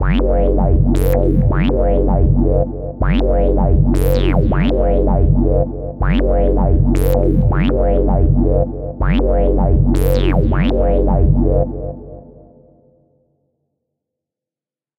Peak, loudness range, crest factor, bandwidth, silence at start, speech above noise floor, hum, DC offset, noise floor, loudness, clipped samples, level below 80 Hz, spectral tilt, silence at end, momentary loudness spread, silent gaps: 0 dBFS; 4 LU; 12 dB; 16 kHz; 0 s; over 77 dB; none; under 0.1%; under -90 dBFS; -15 LUFS; under 0.1%; -16 dBFS; -8.5 dB/octave; 2.75 s; 4 LU; none